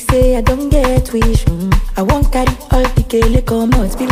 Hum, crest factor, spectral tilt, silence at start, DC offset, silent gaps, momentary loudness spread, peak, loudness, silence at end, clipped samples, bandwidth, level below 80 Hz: none; 12 dB; -6.5 dB/octave; 0 s; under 0.1%; none; 3 LU; 0 dBFS; -14 LUFS; 0 s; under 0.1%; 16 kHz; -16 dBFS